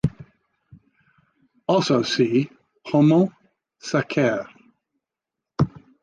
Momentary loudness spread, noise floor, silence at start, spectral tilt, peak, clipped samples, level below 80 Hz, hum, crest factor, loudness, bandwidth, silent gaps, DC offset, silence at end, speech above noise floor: 17 LU; -86 dBFS; 0.05 s; -6.5 dB/octave; -6 dBFS; under 0.1%; -52 dBFS; none; 18 dB; -22 LUFS; 9.4 kHz; none; under 0.1%; 0.35 s; 67 dB